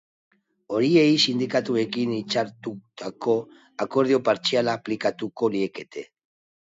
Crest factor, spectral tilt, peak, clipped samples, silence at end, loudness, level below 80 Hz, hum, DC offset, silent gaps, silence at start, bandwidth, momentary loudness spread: 18 dB; -5 dB/octave; -6 dBFS; under 0.1%; 0.6 s; -23 LUFS; -70 dBFS; none; under 0.1%; none; 0.7 s; 7.8 kHz; 17 LU